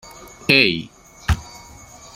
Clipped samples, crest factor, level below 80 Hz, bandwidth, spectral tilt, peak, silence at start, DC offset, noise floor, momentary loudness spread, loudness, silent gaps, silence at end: under 0.1%; 22 dB; -34 dBFS; 16.5 kHz; -4.5 dB/octave; 0 dBFS; 0.05 s; under 0.1%; -42 dBFS; 23 LU; -18 LUFS; none; 0.6 s